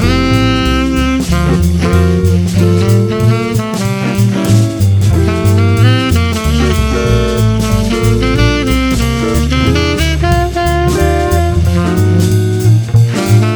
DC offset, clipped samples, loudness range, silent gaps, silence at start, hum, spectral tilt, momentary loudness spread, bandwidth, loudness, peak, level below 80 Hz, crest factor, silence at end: under 0.1%; under 0.1%; 1 LU; none; 0 s; none; -6 dB/octave; 3 LU; over 20 kHz; -11 LUFS; 0 dBFS; -20 dBFS; 10 dB; 0 s